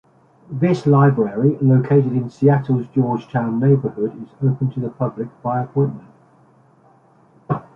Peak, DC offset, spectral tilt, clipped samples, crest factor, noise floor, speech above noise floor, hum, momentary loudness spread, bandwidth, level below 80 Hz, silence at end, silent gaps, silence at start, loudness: -2 dBFS; under 0.1%; -10.5 dB/octave; under 0.1%; 16 dB; -53 dBFS; 35 dB; none; 11 LU; 6.8 kHz; -58 dBFS; 0.15 s; none; 0.5 s; -18 LUFS